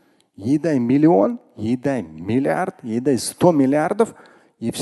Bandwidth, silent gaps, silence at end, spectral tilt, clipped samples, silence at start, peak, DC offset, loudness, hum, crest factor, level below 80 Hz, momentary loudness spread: 12.5 kHz; none; 0 s; -6.5 dB/octave; under 0.1%; 0.4 s; -2 dBFS; under 0.1%; -19 LUFS; none; 18 dB; -56 dBFS; 11 LU